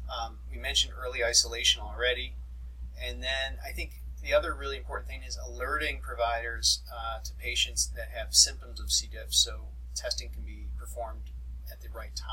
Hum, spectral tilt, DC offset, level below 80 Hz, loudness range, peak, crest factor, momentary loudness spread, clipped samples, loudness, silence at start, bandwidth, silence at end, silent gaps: none; -1 dB/octave; under 0.1%; -40 dBFS; 6 LU; -8 dBFS; 24 dB; 18 LU; under 0.1%; -29 LUFS; 0 s; 16.5 kHz; 0 s; none